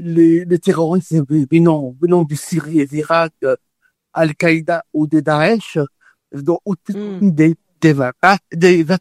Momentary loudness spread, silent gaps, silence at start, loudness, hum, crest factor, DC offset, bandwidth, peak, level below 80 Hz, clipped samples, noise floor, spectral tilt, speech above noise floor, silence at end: 10 LU; none; 0 s; -15 LUFS; none; 14 dB; under 0.1%; 13 kHz; 0 dBFS; -58 dBFS; under 0.1%; -58 dBFS; -7 dB/octave; 43 dB; 0 s